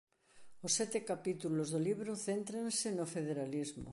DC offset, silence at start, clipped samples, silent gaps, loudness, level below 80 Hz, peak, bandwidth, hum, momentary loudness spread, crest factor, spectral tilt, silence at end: under 0.1%; 0.35 s; under 0.1%; none; -38 LUFS; -70 dBFS; -20 dBFS; 11.5 kHz; none; 5 LU; 20 dB; -4 dB/octave; 0 s